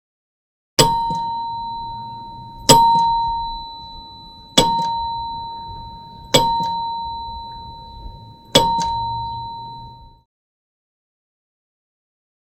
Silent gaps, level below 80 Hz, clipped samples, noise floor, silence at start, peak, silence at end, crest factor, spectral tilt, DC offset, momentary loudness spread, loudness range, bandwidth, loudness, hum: none; -40 dBFS; under 0.1%; -40 dBFS; 0.8 s; 0 dBFS; 2.45 s; 22 dB; -3 dB/octave; under 0.1%; 21 LU; 6 LU; 16.5 kHz; -18 LUFS; none